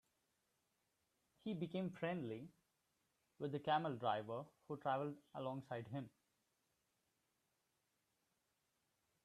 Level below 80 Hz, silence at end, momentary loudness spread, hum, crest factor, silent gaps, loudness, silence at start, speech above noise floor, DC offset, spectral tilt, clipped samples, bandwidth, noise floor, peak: -86 dBFS; 3.15 s; 12 LU; none; 22 dB; none; -45 LUFS; 1.45 s; 42 dB; under 0.1%; -7.5 dB/octave; under 0.1%; 13 kHz; -86 dBFS; -26 dBFS